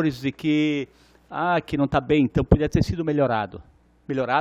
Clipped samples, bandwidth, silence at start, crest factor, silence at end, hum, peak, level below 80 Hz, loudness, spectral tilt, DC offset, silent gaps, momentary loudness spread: under 0.1%; 11 kHz; 0 s; 22 dB; 0 s; none; 0 dBFS; -38 dBFS; -23 LUFS; -7.5 dB/octave; under 0.1%; none; 10 LU